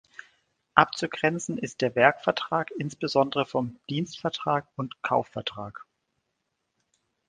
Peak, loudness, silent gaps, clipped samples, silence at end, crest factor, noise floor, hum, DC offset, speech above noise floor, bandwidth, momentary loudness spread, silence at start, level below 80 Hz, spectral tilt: 0 dBFS; -27 LUFS; none; under 0.1%; 1.45 s; 28 dB; -79 dBFS; none; under 0.1%; 53 dB; 10 kHz; 12 LU; 0.75 s; -66 dBFS; -5 dB/octave